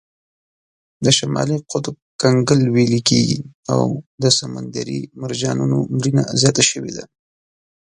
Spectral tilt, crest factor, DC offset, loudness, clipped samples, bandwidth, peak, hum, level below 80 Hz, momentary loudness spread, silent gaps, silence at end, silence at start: -4.5 dB/octave; 18 dB; under 0.1%; -18 LUFS; under 0.1%; 11 kHz; 0 dBFS; none; -54 dBFS; 12 LU; 2.02-2.19 s, 3.54-3.63 s, 4.06-4.18 s; 0.8 s; 1 s